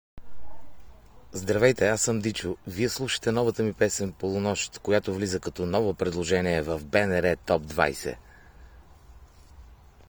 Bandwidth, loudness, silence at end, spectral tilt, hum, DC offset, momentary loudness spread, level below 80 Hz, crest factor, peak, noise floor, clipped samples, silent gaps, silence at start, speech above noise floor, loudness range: over 20 kHz; -26 LUFS; 0.05 s; -4.5 dB/octave; none; under 0.1%; 7 LU; -52 dBFS; 22 dB; -6 dBFS; -51 dBFS; under 0.1%; none; 0.15 s; 24 dB; 2 LU